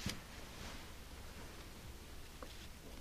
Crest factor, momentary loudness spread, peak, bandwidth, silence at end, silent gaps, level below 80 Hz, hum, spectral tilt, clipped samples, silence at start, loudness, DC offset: 24 dB; 4 LU; -26 dBFS; 15 kHz; 0 s; none; -54 dBFS; none; -3.5 dB/octave; under 0.1%; 0 s; -52 LUFS; under 0.1%